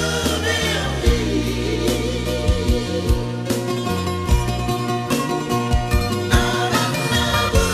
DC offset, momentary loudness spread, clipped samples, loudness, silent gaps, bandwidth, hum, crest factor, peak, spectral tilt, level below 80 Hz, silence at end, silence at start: under 0.1%; 5 LU; under 0.1%; -20 LUFS; none; 15.5 kHz; none; 16 dB; -2 dBFS; -4.5 dB/octave; -26 dBFS; 0 s; 0 s